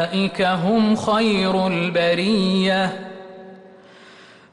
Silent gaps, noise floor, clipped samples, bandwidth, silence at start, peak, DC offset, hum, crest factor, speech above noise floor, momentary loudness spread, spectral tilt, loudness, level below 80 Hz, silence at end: none; -46 dBFS; under 0.1%; 11 kHz; 0 s; -8 dBFS; under 0.1%; none; 12 dB; 27 dB; 14 LU; -6 dB/octave; -19 LUFS; -56 dBFS; 0.85 s